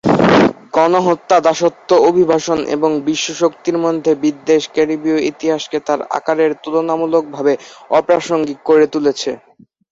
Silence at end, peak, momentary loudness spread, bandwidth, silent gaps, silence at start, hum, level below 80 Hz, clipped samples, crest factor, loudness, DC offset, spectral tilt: 0.55 s; 0 dBFS; 7 LU; 7.8 kHz; none; 0.05 s; none; -54 dBFS; under 0.1%; 14 dB; -15 LUFS; under 0.1%; -5 dB/octave